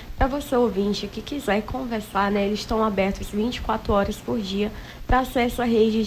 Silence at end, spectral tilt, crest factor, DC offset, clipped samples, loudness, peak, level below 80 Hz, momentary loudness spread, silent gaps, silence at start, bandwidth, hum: 0 s; -5.5 dB/octave; 18 dB; under 0.1%; under 0.1%; -24 LUFS; -6 dBFS; -36 dBFS; 7 LU; none; 0 s; 16 kHz; none